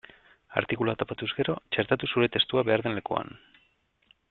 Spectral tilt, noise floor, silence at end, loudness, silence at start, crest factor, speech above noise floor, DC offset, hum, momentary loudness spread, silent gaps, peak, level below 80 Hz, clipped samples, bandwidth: -9 dB/octave; -69 dBFS; 0.95 s; -28 LUFS; 0.5 s; 24 dB; 41 dB; under 0.1%; none; 8 LU; none; -4 dBFS; -62 dBFS; under 0.1%; 4.3 kHz